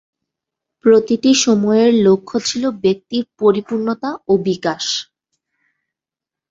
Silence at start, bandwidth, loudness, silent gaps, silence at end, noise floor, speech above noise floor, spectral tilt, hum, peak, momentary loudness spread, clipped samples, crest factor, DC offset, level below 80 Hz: 0.85 s; 7.8 kHz; -16 LUFS; none; 1.45 s; -87 dBFS; 72 dB; -4.5 dB/octave; none; -2 dBFS; 9 LU; under 0.1%; 16 dB; under 0.1%; -58 dBFS